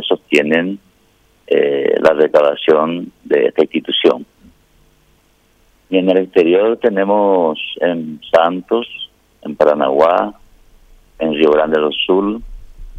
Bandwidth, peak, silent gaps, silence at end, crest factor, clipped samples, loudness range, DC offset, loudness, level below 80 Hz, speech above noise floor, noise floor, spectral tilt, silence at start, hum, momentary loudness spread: 8.8 kHz; 0 dBFS; none; 0 s; 14 dB; under 0.1%; 3 LU; under 0.1%; -14 LUFS; -44 dBFS; 41 dB; -54 dBFS; -6 dB/octave; 0 s; none; 12 LU